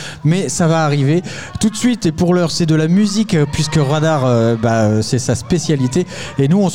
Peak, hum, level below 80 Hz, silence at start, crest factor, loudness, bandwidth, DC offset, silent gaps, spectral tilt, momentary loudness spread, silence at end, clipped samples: -4 dBFS; none; -42 dBFS; 0 s; 10 dB; -15 LUFS; 15.5 kHz; 1%; none; -6 dB/octave; 4 LU; 0 s; under 0.1%